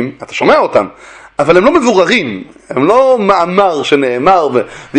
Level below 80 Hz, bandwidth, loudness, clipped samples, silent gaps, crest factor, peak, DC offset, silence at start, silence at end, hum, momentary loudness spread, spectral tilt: -46 dBFS; 9.6 kHz; -10 LUFS; 0.3%; none; 10 dB; 0 dBFS; under 0.1%; 0 s; 0 s; none; 12 LU; -5 dB/octave